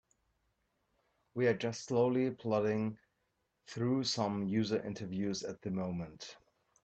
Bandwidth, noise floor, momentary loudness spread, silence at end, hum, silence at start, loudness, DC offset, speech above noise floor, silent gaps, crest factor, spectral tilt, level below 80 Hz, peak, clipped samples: 8.6 kHz; -82 dBFS; 14 LU; 0.5 s; none; 1.35 s; -35 LUFS; under 0.1%; 47 dB; none; 18 dB; -5.5 dB/octave; -72 dBFS; -18 dBFS; under 0.1%